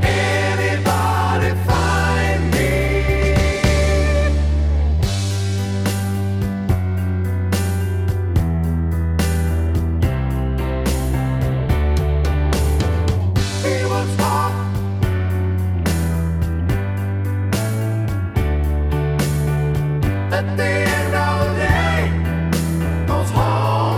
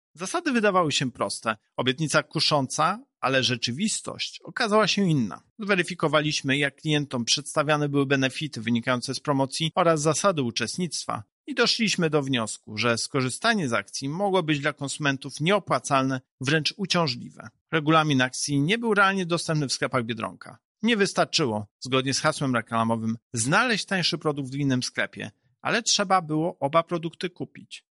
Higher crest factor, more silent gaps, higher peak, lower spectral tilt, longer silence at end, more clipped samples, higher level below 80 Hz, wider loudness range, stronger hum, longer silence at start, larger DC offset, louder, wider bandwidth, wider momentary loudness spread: about the same, 16 dB vs 18 dB; second, none vs 5.50-5.56 s, 11.32-11.44 s, 16.31-16.38 s, 17.61-17.66 s, 20.65-20.75 s, 21.71-21.79 s, 23.22-23.31 s; first, -2 dBFS vs -8 dBFS; first, -6 dB/octave vs -4 dB/octave; second, 0 s vs 0.2 s; neither; first, -24 dBFS vs -66 dBFS; about the same, 3 LU vs 2 LU; neither; second, 0 s vs 0.2 s; neither; first, -19 LUFS vs -25 LUFS; first, 16 kHz vs 11.5 kHz; second, 4 LU vs 9 LU